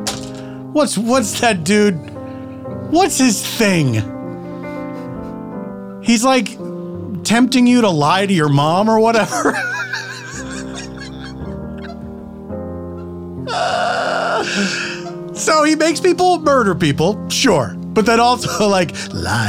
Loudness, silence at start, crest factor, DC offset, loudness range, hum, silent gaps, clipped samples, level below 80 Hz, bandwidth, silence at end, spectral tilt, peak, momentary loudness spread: -15 LUFS; 0 s; 14 dB; under 0.1%; 9 LU; none; none; under 0.1%; -48 dBFS; 17 kHz; 0 s; -4.5 dB/octave; -2 dBFS; 16 LU